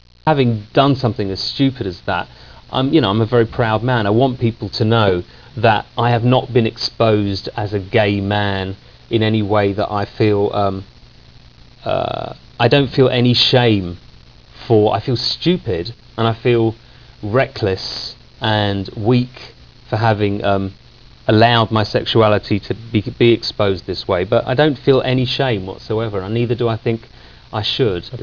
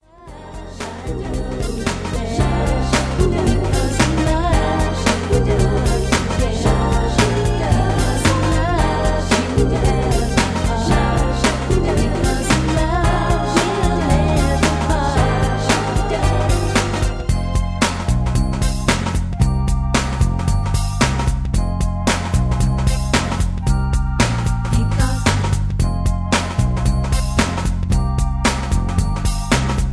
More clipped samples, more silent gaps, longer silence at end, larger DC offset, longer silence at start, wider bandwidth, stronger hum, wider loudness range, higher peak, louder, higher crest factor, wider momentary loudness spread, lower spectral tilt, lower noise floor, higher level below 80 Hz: neither; neither; about the same, 0 s vs 0 s; first, 0.2% vs under 0.1%; about the same, 0.25 s vs 0.2 s; second, 5.4 kHz vs 11 kHz; neither; about the same, 4 LU vs 2 LU; about the same, 0 dBFS vs 0 dBFS; about the same, -17 LUFS vs -18 LUFS; about the same, 16 dB vs 16 dB; first, 10 LU vs 4 LU; first, -7 dB/octave vs -5.5 dB/octave; first, -44 dBFS vs -37 dBFS; second, -42 dBFS vs -22 dBFS